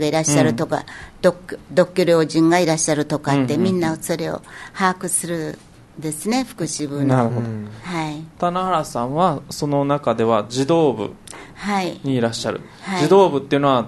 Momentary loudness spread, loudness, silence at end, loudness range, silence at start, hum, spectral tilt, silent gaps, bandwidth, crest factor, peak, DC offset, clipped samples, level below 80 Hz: 13 LU; -19 LUFS; 0 s; 4 LU; 0 s; none; -5 dB/octave; none; 12.5 kHz; 18 dB; -2 dBFS; under 0.1%; under 0.1%; -52 dBFS